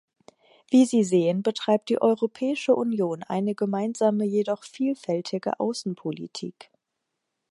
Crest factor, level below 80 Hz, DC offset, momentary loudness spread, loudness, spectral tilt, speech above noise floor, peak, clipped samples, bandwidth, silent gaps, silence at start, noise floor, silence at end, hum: 18 dB; -78 dBFS; under 0.1%; 11 LU; -25 LUFS; -6 dB/octave; 57 dB; -8 dBFS; under 0.1%; 11.5 kHz; none; 0.7 s; -82 dBFS; 1 s; none